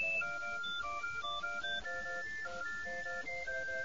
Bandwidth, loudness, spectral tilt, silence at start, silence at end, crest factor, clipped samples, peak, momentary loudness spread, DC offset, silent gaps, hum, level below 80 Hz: 7.4 kHz; -39 LUFS; 1 dB/octave; 0 s; 0 s; 12 dB; under 0.1%; -28 dBFS; 3 LU; 0.4%; none; none; -64 dBFS